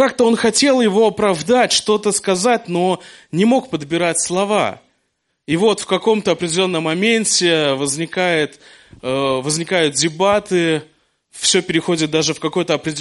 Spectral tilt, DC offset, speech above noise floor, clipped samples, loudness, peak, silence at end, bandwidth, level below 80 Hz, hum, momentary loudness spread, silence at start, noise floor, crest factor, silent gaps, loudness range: -3.5 dB/octave; under 0.1%; 53 dB; under 0.1%; -16 LUFS; -2 dBFS; 0 s; 11.5 kHz; -56 dBFS; none; 6 LU; 0 s; -69 dBFS; 16 dB; none; 3 LU